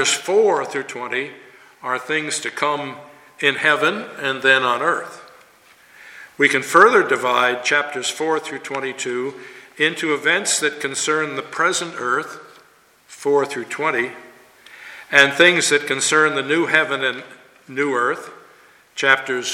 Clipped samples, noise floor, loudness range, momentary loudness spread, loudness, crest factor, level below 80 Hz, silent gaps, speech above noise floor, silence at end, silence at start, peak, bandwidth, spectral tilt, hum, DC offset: under 0.1%; -53 dBFS; 6 LU; 16 LU; -18 LUFS; 20 dB; -70 dBFS; none; 34 dB; 0 s; 0 s; 0 dBFS; 16.5 kHz; -2 dB/octave; none; under 0.1%